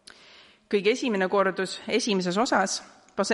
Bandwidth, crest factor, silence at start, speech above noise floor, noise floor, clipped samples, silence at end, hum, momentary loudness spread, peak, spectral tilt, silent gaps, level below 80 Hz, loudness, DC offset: 11.5 kHz; 18 dB; 0.7 s; 28 dB; -54 dBFS; under 0.1%; 0 s; none; 7 LU; -8 dBFS; -4 dB/octave; none; -70 dBFS; -25 LUFS; under 0.1%